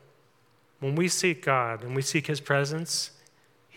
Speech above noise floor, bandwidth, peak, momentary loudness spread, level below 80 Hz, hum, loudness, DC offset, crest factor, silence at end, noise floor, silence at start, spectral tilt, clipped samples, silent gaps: 37 dB; 17.5 kHz; -8 dBFS; 6 LU; -82 dBFS; none; -27 LUFS; under 0.1%; 20 dB; 0.7 s; -64 dBFS; 0.8 s; -4 dB/octave; under 0.1%; none